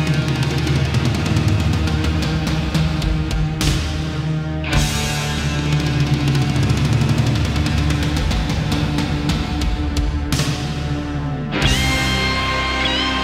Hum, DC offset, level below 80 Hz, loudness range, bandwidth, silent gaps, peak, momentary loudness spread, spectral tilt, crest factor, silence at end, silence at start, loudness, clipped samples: none; under 0.1%; -26 dBFS; 2 LU; 16 kHz; none; -4 dBFS; 5 LU; -5 dB/octave; 16 dB; 0 s; 0 s; -19 LUFS; under 0.1%